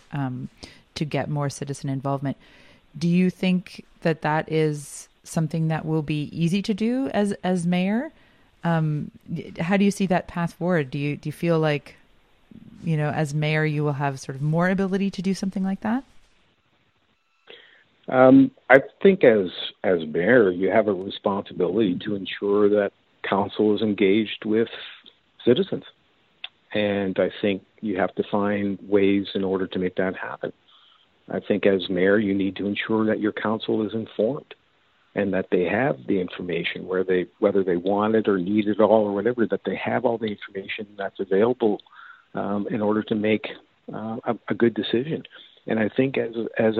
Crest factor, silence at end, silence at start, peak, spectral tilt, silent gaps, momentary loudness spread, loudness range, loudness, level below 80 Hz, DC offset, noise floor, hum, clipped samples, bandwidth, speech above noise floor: 24 dB; 0 s; 0.1 s; 0 dBFS; -7 dB/octave; none; 12 LU; 6 LU; -23 LUFS; -60 dBFS; under 0.1%; -67 dBFS; none; under 0.1%; 13 kHz; 45 dB